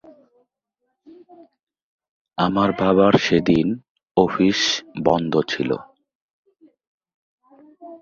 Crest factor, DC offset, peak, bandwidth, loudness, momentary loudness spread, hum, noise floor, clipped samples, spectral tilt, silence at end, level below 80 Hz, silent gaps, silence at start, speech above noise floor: 22 dB; under 0.1%; 0 dBFS; 7.6 kHz; -19 LUFS; 10 LU; none; -77 dBFS; under 0.1%; -5.5 dB/octave; 0.05 s; -52 dBFS; 3.90-3.95 s, 4.11-4.15 s, 6.15-6.43 s, 6.87-6.98 s, 7.14-7.38 s; 2.4 s; 58 dB